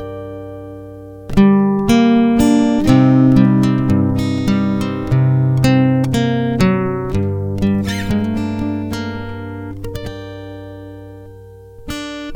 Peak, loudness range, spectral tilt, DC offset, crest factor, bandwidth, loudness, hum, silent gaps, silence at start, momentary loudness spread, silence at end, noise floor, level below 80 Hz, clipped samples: 0 dBFS; 13 LU; -7.5 dB/octave; under 0.1%; 16 dB; 17 kHz; -15 LUFS; none; none; 0 s; 20 LU; 0 s; -37 dBFS; -34 dBFS; under 0.1%